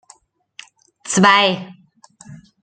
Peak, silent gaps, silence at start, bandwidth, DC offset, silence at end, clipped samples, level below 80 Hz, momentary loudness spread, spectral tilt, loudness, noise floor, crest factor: -2 dBFS; none; 1.05 s; 9.6 kHz; under 0.1%; 0.3 s; under 0.1%; -66 dBFS; 26 LU; -3.5 dB/octave; -14 LUFS; -52 dBFS; 18 dB